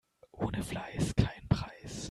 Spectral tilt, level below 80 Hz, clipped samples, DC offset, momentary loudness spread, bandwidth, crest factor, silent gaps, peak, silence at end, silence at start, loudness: -6 dB/octave; -46 dBFS; under 0.1%; under 0.1%; 9 LU; 13 kHz; 24 dB; none; -10 dBFS; 0 s; 0.35 s; -35 LUFS